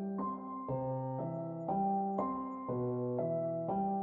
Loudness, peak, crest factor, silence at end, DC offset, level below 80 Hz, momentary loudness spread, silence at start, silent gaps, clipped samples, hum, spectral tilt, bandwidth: -37 LUFS; -20 dBFS; 16 dB; 0 s; under 0.1%; -68 dBFS; 6 LU; 0 s; none; under 0.1%; none; -11.5 dB/octave; 3.2 kHz